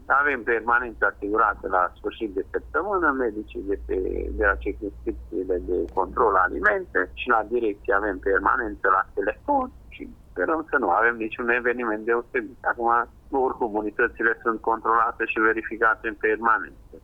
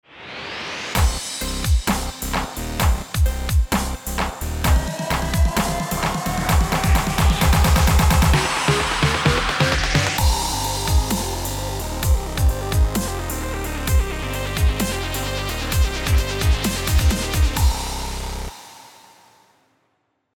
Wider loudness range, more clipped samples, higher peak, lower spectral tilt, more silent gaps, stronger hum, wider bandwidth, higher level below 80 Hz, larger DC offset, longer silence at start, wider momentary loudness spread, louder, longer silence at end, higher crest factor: about the same, 3 LU vs 5 LU; neither; second, -6 dBFS vs -2 dBFS; first, -7.5 dB/octave vs -4 dB/octave; neither; neither; second, 5.4 kHz vs over 20 kHz; second, -44 dBFS vs -24 dBFS; neither; second, 0 s vs 0.15 s; about the same, 9 LU vs 9 LU; second, -24 LUFS vs -21 LUFS; second, 0.05 s vs 1.5 s; about the same, 18 dB vs 18 dB